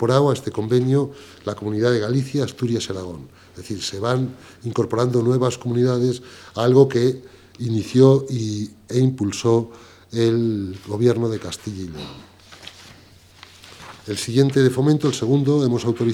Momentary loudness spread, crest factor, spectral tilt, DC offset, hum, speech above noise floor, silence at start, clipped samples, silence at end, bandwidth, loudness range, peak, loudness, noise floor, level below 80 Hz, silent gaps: 17 LU; 20 dB; -6.5 dB/octave; under 0.1%; none; 29 dB; 0 s; under 0.1%; 0 s; 13 kHz; 6 LU; 0 dBFS; -20 LUFS; -48 dBFS; -58 dBFS; none